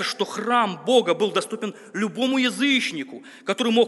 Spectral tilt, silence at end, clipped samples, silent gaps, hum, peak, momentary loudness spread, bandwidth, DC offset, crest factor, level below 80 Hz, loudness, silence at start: -3.5 dB/octave; 0 s; under 0.1%; none; none; -6 dBFS; 12 LU; 11.5 kHz; under 0.1%; 18 dB; -80 dBFS; -22 LUFS; 0 s